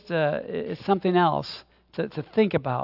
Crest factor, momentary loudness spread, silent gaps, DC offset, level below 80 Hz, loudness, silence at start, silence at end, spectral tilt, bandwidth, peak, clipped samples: 18 dB; 14 LU; none; under 0.1%; -62 dBFS; -25 LUFS; 0.05 s; 0 s; -8.5 dB/octave; 5.8 kHz; -8 dBFS; under 0.1%